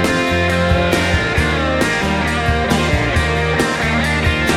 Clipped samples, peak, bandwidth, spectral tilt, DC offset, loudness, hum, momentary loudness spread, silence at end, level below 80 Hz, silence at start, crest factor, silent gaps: under 0.1%; -2 dBFS; 16 kHz; -5 dB/octave; under 0.1%; -16 LUFS; none; 2 LU; 0 s; -26 dBFS; 0 s; 14 dB; none